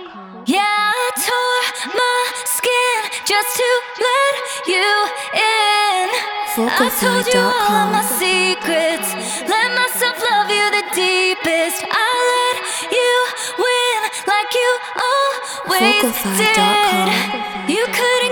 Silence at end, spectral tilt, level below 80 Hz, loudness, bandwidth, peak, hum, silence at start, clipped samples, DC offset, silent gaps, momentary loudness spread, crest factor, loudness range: 0 s; -2 dB/octave; -58 dBFS; -16 LUFS; over 20 kHz; -2 dBFS; none; 0 s; under 0.1%; under 0.1%; none; 5 LU; 16 dB; 1 LU